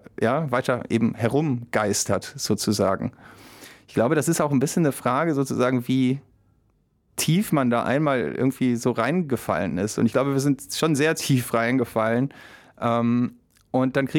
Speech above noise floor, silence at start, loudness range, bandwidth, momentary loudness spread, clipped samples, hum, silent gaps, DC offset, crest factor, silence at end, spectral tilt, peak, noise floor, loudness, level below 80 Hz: 43 dB; 0.2 s; 1 LU; 18.5 kHz; 5 LU; under 0.1%; none; none; under 0.1%; 16 dB; 0 s; -5.5 dB/octave; -8 dBFS; -65 dBFS; -23 LUFS; -60 dBFS